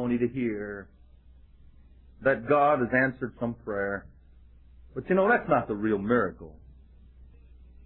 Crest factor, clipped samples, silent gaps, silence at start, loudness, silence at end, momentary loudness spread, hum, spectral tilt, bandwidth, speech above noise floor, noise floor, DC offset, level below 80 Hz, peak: 18 dB; under 0.1%; none; 0 s; -27 LUFS; 0.2 s; 16 LU; none; -11 dB/octave; 4.2 kHz; 27 dB; -54 dBFS; under 0.1%; -54 dBFS; -10 dBFS